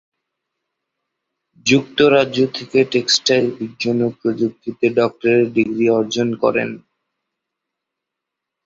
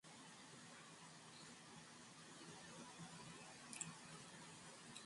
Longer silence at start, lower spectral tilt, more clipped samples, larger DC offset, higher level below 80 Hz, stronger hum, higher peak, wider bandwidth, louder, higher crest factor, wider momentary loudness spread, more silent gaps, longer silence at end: first, 1.65 s vs 0.05 s; first, -4.5 dB/octave vs -2.5 dB/octave; neither; neither; first, -58 dBFS vs -88 dBFS; neither; first, 0 dBFS vs -32 dBFS; second, 7.8 kHz vs 11.5 kHz; first, -17 LUFS vs -57 LUFS; second, 18 dB vs 28 dB; about the same, 9 LU vs 8 LU; neither; first, 1.9 s vs 0 s